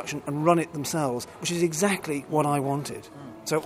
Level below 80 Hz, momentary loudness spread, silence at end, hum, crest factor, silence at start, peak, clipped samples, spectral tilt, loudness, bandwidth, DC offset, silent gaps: -64 dBFS; 13 LU; 0 s; none; 20 dB; 0 s; -6 dBFS; under 0.1%; -5 dB/octave; -26 LUFS; 16 kHz; under 0.1%; none